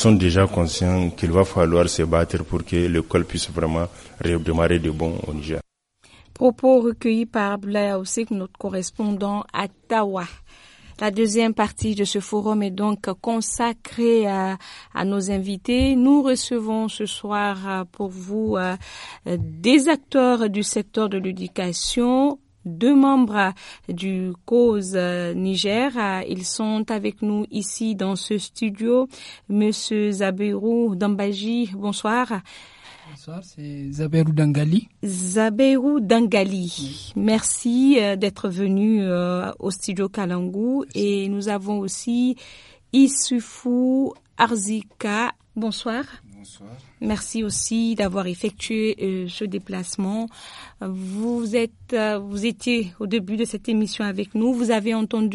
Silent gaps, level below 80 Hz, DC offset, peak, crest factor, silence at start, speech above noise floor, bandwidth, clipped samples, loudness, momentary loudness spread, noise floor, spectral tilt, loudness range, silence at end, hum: none; -44 dBFS; under 0.1%; -2 dBFS; 20 dB; 0 s; 35 dB; 11.5 kHz; under 0.1%; -22 LUFS; 11 LU; -57 dBFS; -5 dB/octave; 5 LU; 0 s; none